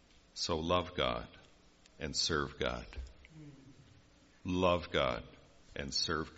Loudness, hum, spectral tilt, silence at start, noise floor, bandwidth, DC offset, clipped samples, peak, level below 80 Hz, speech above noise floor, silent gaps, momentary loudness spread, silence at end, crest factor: -35 LUFS; none; -3 dB/octave; 0.35 s; -63 dBFS; 8 kHz; under 0.1%; under 0.1%; -16 dBFS; -54 dBFS; 28 dB; none; 22 LU; 0 s; 22 dB